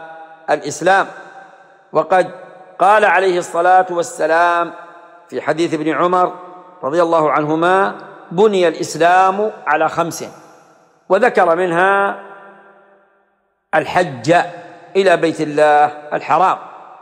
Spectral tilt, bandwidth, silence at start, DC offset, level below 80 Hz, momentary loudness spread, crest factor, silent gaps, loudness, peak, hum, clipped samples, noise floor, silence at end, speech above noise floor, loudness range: -4.5 dB/octave; 15 kHz; 0 s; under 0.1%; -64 dBFS; 13 LU; 14 dB; none; -15 LUFS; -2 dBFS; none; under 0.1%; -63 dBFS; 0.1 s; 49 dB; 3 LU